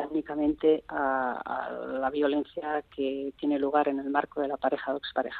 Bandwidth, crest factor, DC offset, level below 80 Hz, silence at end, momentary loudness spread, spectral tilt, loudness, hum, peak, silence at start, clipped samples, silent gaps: 4.7 kHz; 20 dB; under 0.1%; -62 dBFS; 0 s; 7 LU; -7.5 dB/octave; -29 LUFS; none; -10 dBFS; 0 s; under 0.1%; none